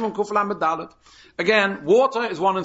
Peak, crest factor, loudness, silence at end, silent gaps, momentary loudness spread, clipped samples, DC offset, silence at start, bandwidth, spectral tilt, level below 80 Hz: -4 dBFS; 16 dB; -21 LUFS; 0 s; none; 12 LU; under 0.1%; under 0.1%; 0 s; 8 kHz; -5 dB/octave; -62 dBFS